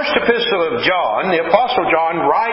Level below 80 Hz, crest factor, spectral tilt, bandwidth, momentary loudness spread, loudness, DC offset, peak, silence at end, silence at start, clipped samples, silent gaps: -50 dBFS; 14 dB; -8.5 dB/octave; 5.8 kHz; 2 LU; -15 LUFS; under 0.1%; 0 dBFS; 0 s; 0 s; under 0.1%; none